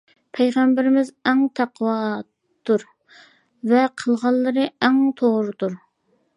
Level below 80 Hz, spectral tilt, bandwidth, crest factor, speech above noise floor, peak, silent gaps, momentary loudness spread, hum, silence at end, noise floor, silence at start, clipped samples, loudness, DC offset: -74 dBFS; -6 dB/octave; 11 kHz; 18 dB; 47 dB; -2 dBFS; none; 10 LU; none; 0.6 s; -66 dBFS; 0.35 s; under 0.1%; -20 LUFS; under 0.1%